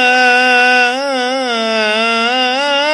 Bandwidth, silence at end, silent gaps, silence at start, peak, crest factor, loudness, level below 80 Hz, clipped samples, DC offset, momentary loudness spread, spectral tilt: 12 kHz; 0 s; none; 0 s; 0 dBFS; 12 dB; -11 LUFS; -62 dBFS; under 0.1%; under 0.1%; 7 LU; -1.5 dB/octave